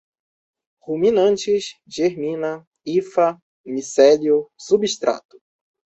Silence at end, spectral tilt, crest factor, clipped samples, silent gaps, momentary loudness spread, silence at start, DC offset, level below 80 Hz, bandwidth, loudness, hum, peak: 0.75 s; -4.5 dB/octave; 18 dB; under 0.1%; 2.67-2.71 s, 3.42-3.64 s; 15 LU; 0.85 s; under 0.1%; -64 dBFS; 8.2 kHz; -19 LUFS; none; -2 dBFS